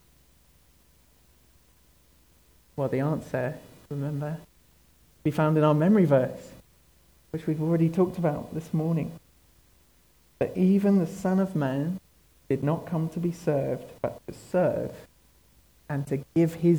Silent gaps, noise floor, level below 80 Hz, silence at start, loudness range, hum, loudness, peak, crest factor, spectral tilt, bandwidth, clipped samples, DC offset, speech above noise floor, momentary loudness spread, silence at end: none; -62 dBFS; -60 dBFS; 2.75 s; 8 LU; none; -27 LUFS; -10 dBFS; 18 dB; -8.5 dB/octave; 19.5 kHz; under 0.1%; under 0.1%; 36 dB; 14 LU; 0 s